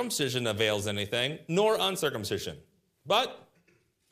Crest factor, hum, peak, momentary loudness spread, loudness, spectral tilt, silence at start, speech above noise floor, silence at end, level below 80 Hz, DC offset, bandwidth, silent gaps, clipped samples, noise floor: 20 dB; none; -10 dBFS; 8 LU; -29 LUFS; -3.5 dB/octave; 0 s; 39 dB; 0.7 s; -68 dBFS; under 0.1%; 15.5 kHz; none; under 0.1%; -68 dBFS